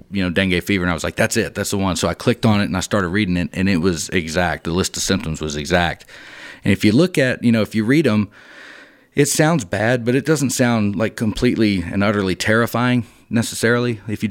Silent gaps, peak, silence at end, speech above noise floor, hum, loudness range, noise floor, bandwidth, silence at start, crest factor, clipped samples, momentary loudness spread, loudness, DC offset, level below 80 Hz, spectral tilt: none; 0 dBFS; 0 s; 25 dB; none; 2 LU; -43 dBFS; 17 kHz; 0.1 s; 18 dB; under 0.1%; 7 LU; -18 LUFS; under 0.1%; -42 dBFS; -5 dB/octave